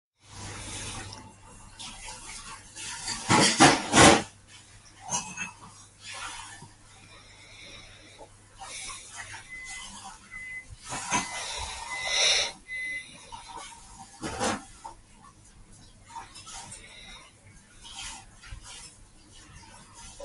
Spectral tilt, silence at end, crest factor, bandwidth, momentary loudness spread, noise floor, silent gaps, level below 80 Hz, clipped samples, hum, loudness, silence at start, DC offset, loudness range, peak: -2.5 dB/octave; 0 s; 28 dB; 11.5 kHz; 27 LU; -54 dBFS; none; -52 dBFS; under 0.1%; none; -26 LUFS; 0.3 s; under 0.1%; 21 LU; -2 dBFS